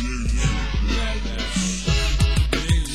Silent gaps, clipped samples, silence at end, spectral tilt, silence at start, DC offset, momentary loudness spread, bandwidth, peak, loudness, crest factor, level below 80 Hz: none; under 0.1%; 0 s; -4.5 dB/octave; 0 s; 0.8%; 5 LU; 12.5 kHz; -6 dBFS; -23 LUFS; 16 dB; -22 dBFS